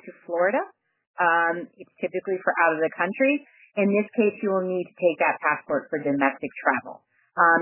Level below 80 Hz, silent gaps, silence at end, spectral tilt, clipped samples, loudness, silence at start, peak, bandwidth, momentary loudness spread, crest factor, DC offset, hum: -78 dBFS; 1.07-1.14 s; 0 s; -9.5 dB/octave; under 0.1%; -24 LUFS; 0.05 s; -6 dBFS; 3.2 kHz; 10 LU; 18 dB; under 0.1%; none